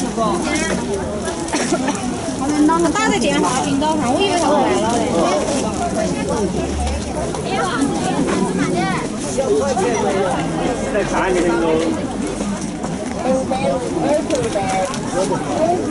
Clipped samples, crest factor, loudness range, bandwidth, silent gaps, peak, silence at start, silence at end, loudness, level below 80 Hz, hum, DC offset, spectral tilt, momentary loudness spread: under 0.1%; 14 dB; 3 LU; 12 kHz; none; -4 dBFS; 0 s; 0 s; -18 LUFS; -36 dBFS; none; under 0.1%; -4.5 dB/octave; 6 LU